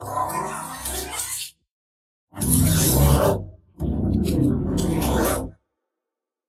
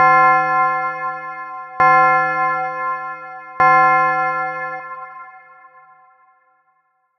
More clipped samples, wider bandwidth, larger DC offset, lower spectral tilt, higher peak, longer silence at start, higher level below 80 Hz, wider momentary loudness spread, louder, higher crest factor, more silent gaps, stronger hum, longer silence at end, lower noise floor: neither; first, 16 kHz vs 6.2 kHz; neither; about the same, -5 dB/octave vs -6 dB/octave; about the same, -2 dBFS vs -2 dBFS; about the same, 0 s vs 0 s; first, -32 dBFS vs -62 dBFS; second, 13 LU vs 20 LU; second, -22 LUFS vs -16 LUFS; about the same, 20 dB vs 16 dB; first, 1.71-2.27 s vs none; neither; second, 0.95 s vs 1.8 s; first, -86 dBFS vs -64 dBFS